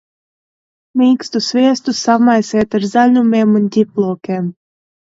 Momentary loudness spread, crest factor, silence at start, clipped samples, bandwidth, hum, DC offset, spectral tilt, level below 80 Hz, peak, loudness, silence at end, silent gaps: 9 LU; 14 dB; 0.95 s; under 0.1%; 7.8 kHz; none; under 0.1%; -5.5 dB/octave; -56 dBFS; 0 dBFS; -14 LUFS; 0.55 s; none